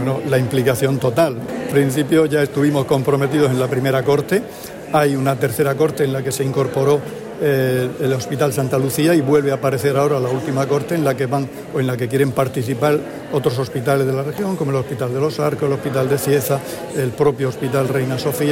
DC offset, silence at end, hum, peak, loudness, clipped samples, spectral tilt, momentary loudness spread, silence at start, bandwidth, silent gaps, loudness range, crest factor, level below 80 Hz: under 0.1%; 0 s; none; -4 dBFS; -18 LUFS; under 0.1%; -6 dB/octave; 5 LU; 0 s; 16.5 kHz; none; 3 LU; 14 dB; -52 dBFS